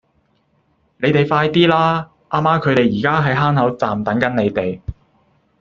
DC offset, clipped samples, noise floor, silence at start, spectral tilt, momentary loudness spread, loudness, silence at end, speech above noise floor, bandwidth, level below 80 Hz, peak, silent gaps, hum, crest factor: under 0.1%; under 0.1%; -61 dBFS; 1 s; -7.5 dB/octave; 9 LU; -16 LUFS; 0.7 s; 46 dB; 7.2 kHz; -46 dBFS; 0 dBFS; none; none; 18 dB